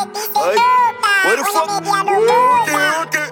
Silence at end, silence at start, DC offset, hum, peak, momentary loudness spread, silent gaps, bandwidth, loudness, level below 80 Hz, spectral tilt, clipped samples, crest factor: 0 s; 0 s; under 0.1%; none; -2 dBFS; 5 LU; none; 17 kHz; -14 LUFS; -66 dBFS; -2 dB/octave; under 0.1%; 12 dB